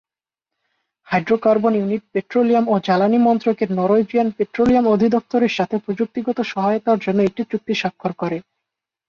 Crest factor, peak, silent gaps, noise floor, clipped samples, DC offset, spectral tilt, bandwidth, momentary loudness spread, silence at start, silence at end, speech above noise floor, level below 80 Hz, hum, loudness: 14 dB; -4 dBFS; none; -86 dBFS; under 0.1%; under 0.1%; -7.5 dB/octave; 7 kHz; 8 LU; 1.1 s; 0.65 s; 69 dB; -56 dBFS; none; -19 LUFS